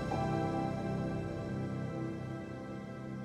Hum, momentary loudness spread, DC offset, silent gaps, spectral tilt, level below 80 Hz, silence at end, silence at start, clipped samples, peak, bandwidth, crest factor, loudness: none; 9 LU; under 0.1%; none; -8 dB/octave; -56 dBFS; 0 s; 0 s; under 0.1%; -22 dBFS; 11 kHz; 14 dB; -38 LUFS